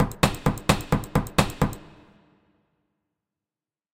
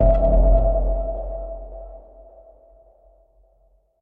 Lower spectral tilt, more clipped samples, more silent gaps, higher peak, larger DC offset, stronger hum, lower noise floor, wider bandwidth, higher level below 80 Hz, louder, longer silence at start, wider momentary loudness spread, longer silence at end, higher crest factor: second, -5 dB/octave vs -12.5 dB/octave; neither; neither; about the same, -4 dBFS vs -4 dBFS; neither; neither; first, under -90 dBFS vs -60 dBFS; first, 17 kHz vs 2.1 kHz; second, -38 dBFS vs -22 dBFS; second, -25 LUFS vs -21 LUFS; about the same, 0 s vs 0 s; second, 5 LU vs 23 LU; about the same, 2.1 s vs 2.05 s; first, 24 dB vs 16 dB